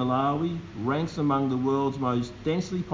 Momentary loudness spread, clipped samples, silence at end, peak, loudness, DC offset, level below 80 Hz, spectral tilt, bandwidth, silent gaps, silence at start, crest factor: 4 LU; under 0.1%; 0 s; -12 dBFS; -27 LUFS; under 0.1%; -52 dBFS; -7.5 dB/octave; 7.6 kHz; none; 0 s; 14 dB